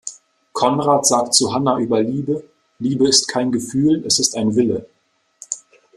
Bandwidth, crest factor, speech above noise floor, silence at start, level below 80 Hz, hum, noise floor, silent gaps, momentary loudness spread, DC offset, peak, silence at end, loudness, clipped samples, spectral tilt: 13.5 kHz; 18 dB; 30 dB; 0.05 s; -58 dBFS; none; -47 dBFS; none; 15 LU; under 0.1%; 0 dBFS; 0.4 s; -17 LUFS; under 0.1%; -3.5 dB/octave